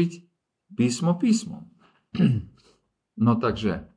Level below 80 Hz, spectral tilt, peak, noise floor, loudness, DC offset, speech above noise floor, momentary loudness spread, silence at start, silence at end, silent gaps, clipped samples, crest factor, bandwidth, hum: -52 dBFS; -6.5 dB/octave; -8 dBFS; -65 dBFS; -24 LUFS; under 0.1%; 41 dB; 17 LU; 0 s; 0.1 s; none; under 0.1%; 18 dB; 10.5 kHz; none